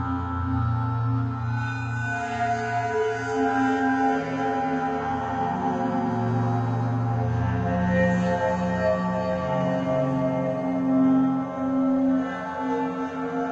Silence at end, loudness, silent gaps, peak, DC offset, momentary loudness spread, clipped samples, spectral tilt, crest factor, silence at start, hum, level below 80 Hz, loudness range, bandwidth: 0 s; -25 LUFS; none; -12 dBFS; under 0.1%; 6 LU; under 0.1%; -8 dB/octave; 12 dB; 0 s; none; -52 dBFS; 2 LU; 8 kHz